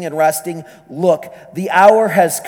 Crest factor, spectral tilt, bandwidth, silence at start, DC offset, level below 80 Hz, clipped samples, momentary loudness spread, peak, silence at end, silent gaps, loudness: 14 dB; -4.5 dB/octave; 19.5 kHz; 0 s; under 0.1%; -64 dBFS; under 0.1%; 20 LU; 0 dBFS; 0 s; none; -13 LUFS